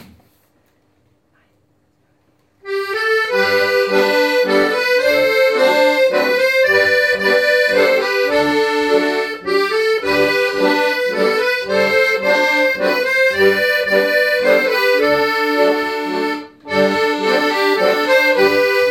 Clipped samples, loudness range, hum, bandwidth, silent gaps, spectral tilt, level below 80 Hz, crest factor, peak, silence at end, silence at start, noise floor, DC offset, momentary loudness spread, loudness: under 0.1%; 4 LU; none; 17 kHz; none; -3.5 dB/octave; -56 dBFS; 14 dB; -2 dBFS; 0 s; 2.65 s; -60 dBFS; under 0.1%; 4 LU; -14 LUFS